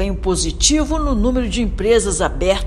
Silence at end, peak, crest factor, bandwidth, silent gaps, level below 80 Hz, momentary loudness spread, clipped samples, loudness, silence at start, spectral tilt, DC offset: 0 s; 0 dBFS; 16 dB; 12.5 kHz; none; -22 dBFS; 5 LU; under 0.1%; -17 LUFS; 0 s; -4 dB/octave; under 0.1%